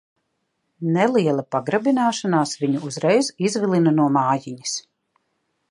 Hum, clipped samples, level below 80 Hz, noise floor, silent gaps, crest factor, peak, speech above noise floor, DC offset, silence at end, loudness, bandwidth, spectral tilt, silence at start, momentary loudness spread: none; under 0.1%; -72 dBFS; -73 dBFS; none; 18 dB; -4 dBFS; 54 dB; under 0.1%; 0.9 s; -21 LUFS; 11.5 kHz; -5.5 dB/octave; 0.8 s; 9 LU